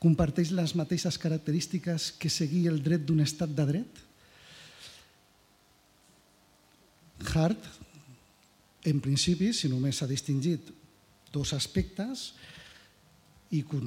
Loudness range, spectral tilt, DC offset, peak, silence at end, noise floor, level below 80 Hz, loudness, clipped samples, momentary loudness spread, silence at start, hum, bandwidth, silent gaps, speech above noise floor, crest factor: 7 LU; -5.5 dB/octave; under 0.1%; -14 dBFS; 0 s; -64 dBFS; -52 dBFS; -30 LUFS; under 0.1%; 21 LU; 0 s; none; 15.5 kHz; none; 35 dB; 18 dB